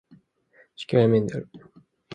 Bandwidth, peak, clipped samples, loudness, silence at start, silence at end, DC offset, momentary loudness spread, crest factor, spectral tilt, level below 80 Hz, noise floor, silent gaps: 9.4 kHz; -6 dBFS; under 0.1%; -23 LUFS; 0.8 s; 0 s; under 0.1%; 21 LU; 20 dB; -8 dB/octave; -62 dBFS; -60 dBFS; none